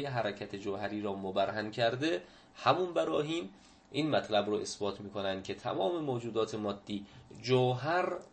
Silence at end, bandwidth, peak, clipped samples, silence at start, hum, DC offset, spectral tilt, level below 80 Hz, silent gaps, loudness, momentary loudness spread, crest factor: 0.1 s; 8.8 kHz; -12 dBFS; under 0.1%; 0 s; none; under 0.1%; -5.5 dB/octave; -70 dBFS; none; -34 LUFS; 10 LU; 22 dB